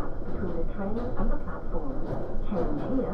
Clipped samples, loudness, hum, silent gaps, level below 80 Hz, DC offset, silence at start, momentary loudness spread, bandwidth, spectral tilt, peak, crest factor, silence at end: under 0.1%; -33 LUFS; none; none; -30 dBFS; under 0.1%; 0 s; 6 LU; 3.6 kHz; -10 dB/octave; -14 dBFS; 12 dB; 0 s